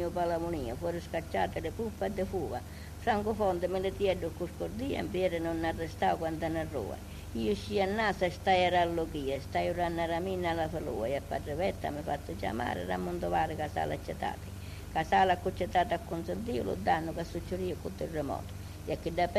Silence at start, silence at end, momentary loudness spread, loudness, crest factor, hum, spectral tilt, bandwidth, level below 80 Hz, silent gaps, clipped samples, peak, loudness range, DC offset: 0 s; 0 s; 8 LU; -33 LUFS; 18 dB; none; -6 dB/octave; 14.5 kHz; -48 dBFS; none; under 0.1%; -14 dBFS; 4 LU; under 0.1%